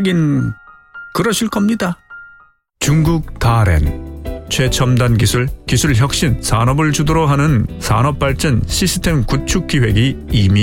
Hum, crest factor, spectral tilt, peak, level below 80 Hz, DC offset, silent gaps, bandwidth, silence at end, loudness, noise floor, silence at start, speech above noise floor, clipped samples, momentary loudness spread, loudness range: none; 12 dB; -5 dB/octave; -2 dBFS; -26 dBFS; under 0.1%; none; 17 kHz; 0 s; -15 LUFS; -48 dBFS; 0 s; 34 dB; under 0.1%; 8 LU; 3 LU